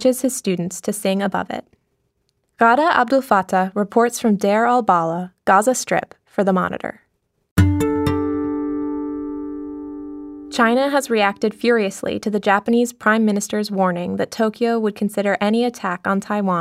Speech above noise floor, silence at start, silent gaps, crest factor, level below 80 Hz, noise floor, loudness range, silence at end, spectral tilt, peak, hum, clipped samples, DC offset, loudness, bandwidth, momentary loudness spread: 51 dB; 0 s; 7.51-7.56 s; 18 dB; -48 dBFS; -69 dBFS; 5 LU; 0 s; -5.5 dB/octave; -2 dBFS; none; under 0.1%; under 0.1%; -19 LUFS; 16 kHz; 12 LU